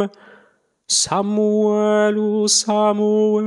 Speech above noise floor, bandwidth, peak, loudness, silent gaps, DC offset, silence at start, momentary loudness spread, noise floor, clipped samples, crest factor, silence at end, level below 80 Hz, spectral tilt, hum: 41 dB; 12.5 kHz; -4 dBFS; -17 LUFS; none; under 0.1%; 0 s; 3 LU; -58 dBFS; under 0.1%; 14 dB; 0 s; -64 dBFS; -3.5 dB/octave; none